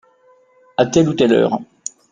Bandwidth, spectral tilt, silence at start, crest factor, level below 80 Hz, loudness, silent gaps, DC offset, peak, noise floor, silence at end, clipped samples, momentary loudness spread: 9.8 kHz; -5.5 dB/octave; 0.8 s; 16 dB; -52 dBFS; -16 LUFS; none; under 0.1%; -2 dBFS; -53 dBFS; 0.45 s; under 0.1%; 15 LU